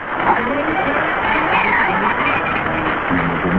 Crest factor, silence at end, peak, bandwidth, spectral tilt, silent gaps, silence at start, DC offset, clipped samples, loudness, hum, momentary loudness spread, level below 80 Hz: 14 dB; 0 s; -2 dBFS; 7.2 kHz; -7.5 dB/octave; none; 0 s; 0.3%; under 0.1%; -16 LUFS; none; 4 LU; -38 dBFS